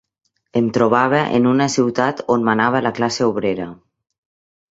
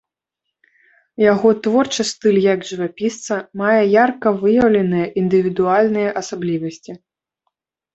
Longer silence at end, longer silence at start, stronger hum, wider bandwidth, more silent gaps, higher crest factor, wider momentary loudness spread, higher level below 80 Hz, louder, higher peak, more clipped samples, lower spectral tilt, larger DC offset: about the same, 0.95 s vs 1 s; second, 0.55 s vs 1.2 s; neither; about the same, 8 kHz vs 8.2 kHz; neither; about the same, 18 dB vs 16 dB; second, 7 LU vs 11 LU; about the same, -58 dBFS vs -56 dBFS; about the same, -17 LUFS vs -17 LUFS; about the same, -2 dBFS vs -2 dBFS; neither; about the same, -5.5 dB/octave vs -5.5 dB/octave; neither